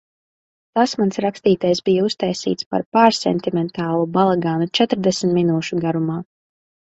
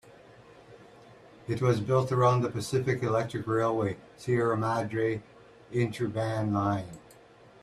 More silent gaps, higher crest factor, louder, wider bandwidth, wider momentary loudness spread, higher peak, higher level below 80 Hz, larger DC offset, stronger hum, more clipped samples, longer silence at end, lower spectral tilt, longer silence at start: first, 2.66-2.71 s, 2.86-2.92 s vs none; about the same, 20 dB vs 20 dB; first, -19 LUFS vs -29 LUFS; second, 8.2 kHz vs 13 kHz; second, 7 LU vs 11 LU; first, 0 dBFS vs -10 dBFS; about the same, -60 dBFS vs -62 dBFS; neither; neither; neither; about the same, 0.7 s vs 0.65 s; second, -5.5 dB/octave vs -7 dB/octave; first, 0.75 s vs 0.05 s